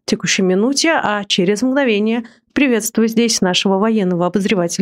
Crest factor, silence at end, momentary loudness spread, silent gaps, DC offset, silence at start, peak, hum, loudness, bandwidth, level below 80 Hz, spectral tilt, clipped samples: 12 dB; 0 s; 3 LU; none; under 0.1%; 0.1 s; -2 dBFS; none; -15 LUFS; 16 kHz; -56 dBFS; -4 dB/octave; under 0.1%